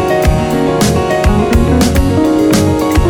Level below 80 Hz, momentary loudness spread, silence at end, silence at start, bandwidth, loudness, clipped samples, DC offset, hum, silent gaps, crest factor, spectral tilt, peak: -18 dBFS; 2 LU; 0 s; 0 s; over 20 kHz; -11 LUFS; under 0.1%; under 0.1%; none; none; 10 dB; -6 dB/octave; 0 dBFS